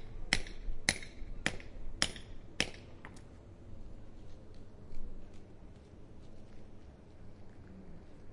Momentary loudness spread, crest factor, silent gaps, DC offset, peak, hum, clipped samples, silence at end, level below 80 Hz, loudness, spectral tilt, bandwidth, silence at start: 21 LU; 32 dB; none; under 0.1%; -8 dBFS; none; under 0.1%; 0 s; -46 dBFS; -38 LUFS; -2 dB/octave; 11.5 kHz; 0 s